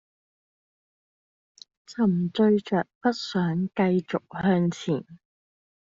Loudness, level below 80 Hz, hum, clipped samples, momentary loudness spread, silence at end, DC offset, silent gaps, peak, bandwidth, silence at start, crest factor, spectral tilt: -25 LUFS; -64 dBFS; none; under 0.1%; 8 LU; 0.75 s; under 0.1%; 2.95-3.01 s; -10 dBFS; 7.6 kHz; 1.9 s; 16 dB; -6.5 dB/octave